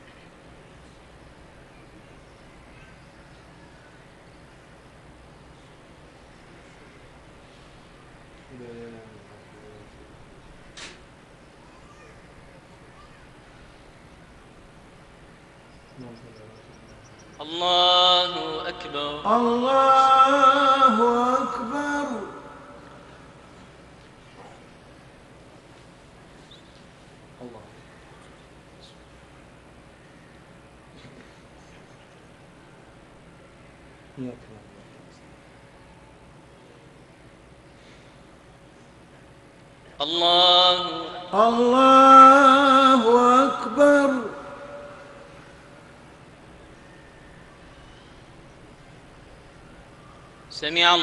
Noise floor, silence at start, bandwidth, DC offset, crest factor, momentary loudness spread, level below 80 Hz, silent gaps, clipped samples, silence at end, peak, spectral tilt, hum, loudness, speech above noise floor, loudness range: -50 dBFS; 8.55 s; 11 kHz; under 0.1%; 22 dB; 28 LU; -58 dBFS; none; under 0.1%; 0 s; -2 dBFS; -3.5 dB/octave; none; -17 LUFS; 28 dB; 19 LU